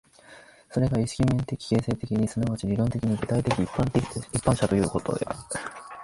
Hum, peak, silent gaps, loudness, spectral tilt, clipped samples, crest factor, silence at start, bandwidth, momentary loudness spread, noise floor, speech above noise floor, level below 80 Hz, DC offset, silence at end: none; -6 dBFS; none; -27 LUFS; -6.5 dB/octave; under 0.1%; 20 dB; 0.3 s; 11.5 kHz; 7 LU; -51 dBFS; 25 dB; -46 dBFS; under 0.1%; 0 s